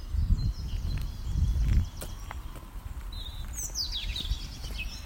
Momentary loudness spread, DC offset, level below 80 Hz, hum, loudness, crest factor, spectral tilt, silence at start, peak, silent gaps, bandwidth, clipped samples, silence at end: 13 LU; under 0.1%; -32 dBFS; none; -33 LUFS; 18 dB; -4 dB/octave; 0 s; -12 dBFS; none; 16.5 kHz; under 0.1%; 0 s